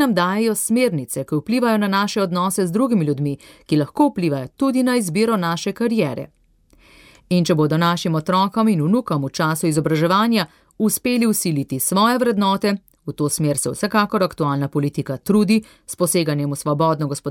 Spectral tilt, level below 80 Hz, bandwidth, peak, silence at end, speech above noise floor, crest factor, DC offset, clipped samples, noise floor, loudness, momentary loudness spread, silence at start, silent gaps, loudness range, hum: -5 dB/octave; -58 dBFS; 17.5 kHz; -4 dBFS; 0 s; 36 dB; 14 dB; under 0.1%; under 0.1%; -54 dBFS; -19 LUFS; 6 LU; 0 s; none; 2 LU; none